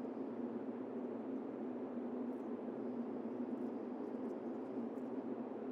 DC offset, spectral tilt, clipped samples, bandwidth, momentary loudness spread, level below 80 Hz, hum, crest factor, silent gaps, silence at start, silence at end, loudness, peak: under 0.1%; -9 dB/octave; under 0.1%; 5.4 kHz; 1 LU; under -90 dBFS; none; 12 dB; none; 0 s; 0 s; -45 LUFS; -30 dBFS